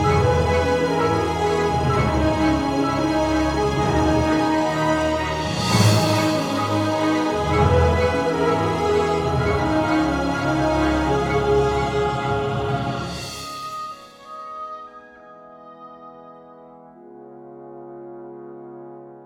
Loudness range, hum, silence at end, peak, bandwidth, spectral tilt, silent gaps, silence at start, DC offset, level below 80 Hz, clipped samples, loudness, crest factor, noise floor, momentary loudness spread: 19 LU; none; 0 s; -2 dBFS; 17 kHz; -6 dB/octave; none; 0 s; under 0.1%; -34 dBFS; under 0.1%; -20 LUFS; 18 dB; -44 dBFS; 20 LU